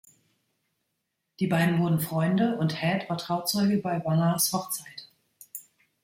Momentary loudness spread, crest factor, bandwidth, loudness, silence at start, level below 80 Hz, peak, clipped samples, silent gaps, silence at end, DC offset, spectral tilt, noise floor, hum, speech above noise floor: 18 LU; 18 dB; 16.5 kHz; -26 LUFS; 1.4 s; -66 dBFS; -10 dBFS; under 0.1%; none; 0.45 s; under 0.1%; -5 dB/octave; -80 dBFS; none; 55 dB